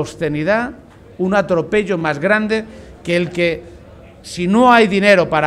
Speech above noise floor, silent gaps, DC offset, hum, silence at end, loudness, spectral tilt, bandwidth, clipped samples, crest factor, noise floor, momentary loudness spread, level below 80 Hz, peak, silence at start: 24 dB; none; under 0.1%; none; 0 s; -15 LUFS; -6 dB/octave; 13 kHz; under 0.1%; 16 dB; -40 dBFS; 15 LU; -46 dBFS; 0 dBFS; 0 s